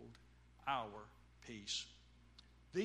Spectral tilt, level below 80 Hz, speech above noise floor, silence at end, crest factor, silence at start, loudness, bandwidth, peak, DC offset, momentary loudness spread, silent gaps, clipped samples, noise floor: -3 dB/octave; -68 dBFS; 20 dB; 0 s; 22 dB; 0 s; -46 LUFS; 12 kHz; -26 dBFS; under 0.1%; 22 LU; none; under 0.1%; -65 dBFS